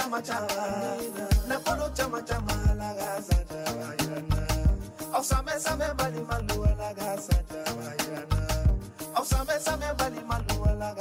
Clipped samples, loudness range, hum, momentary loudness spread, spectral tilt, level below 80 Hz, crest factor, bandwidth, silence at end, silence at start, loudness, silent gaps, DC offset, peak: under 0.1%; 1 LU; none; 5 LU; -5 dB/octave; -32 dBFS; 16 dB; 16.5 kHz; 0 s; 0 s; -29 LUFS; none; under 0.1%; -12 dBFS